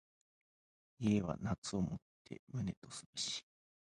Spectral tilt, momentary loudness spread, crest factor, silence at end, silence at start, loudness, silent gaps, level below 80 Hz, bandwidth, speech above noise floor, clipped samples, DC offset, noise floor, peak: -5 dB/octave; 14 LU; 20 dB; 0.45 s; 1 s; -41 LUFS; 1.58-1.62 s, 2.02-2.25 s, 2.39-2.47 s, 2.77-2.82 s, 3.06-3.13 s; -62 dBFS; 11.5 kHz; over 50 dB; under 0.1%; under 0.1%; under -90 dBFS; -22 dBFS